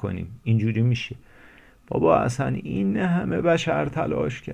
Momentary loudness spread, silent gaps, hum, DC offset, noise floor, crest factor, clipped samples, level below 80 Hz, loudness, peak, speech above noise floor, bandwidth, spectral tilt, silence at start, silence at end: 10 LU; none; none; under 0.1%; -51 dBFS; 20 dB; under 0.1%; -48 dBFS; -24 LUFS; -4 dBFS; 28 dB; 10.5 kHz; -7 dB/octave; 0 s; 0 s